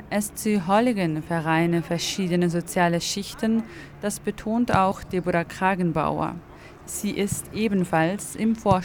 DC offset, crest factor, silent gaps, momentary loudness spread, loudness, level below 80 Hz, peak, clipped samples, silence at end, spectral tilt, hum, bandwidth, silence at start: under 0.1%; 18 dB; none; 8 LU; -24 LUFS; -48 dBFS; -6 dBFS; under 0.1%; 0 s; -5 dB/octave; none; 19 kHz; 0 s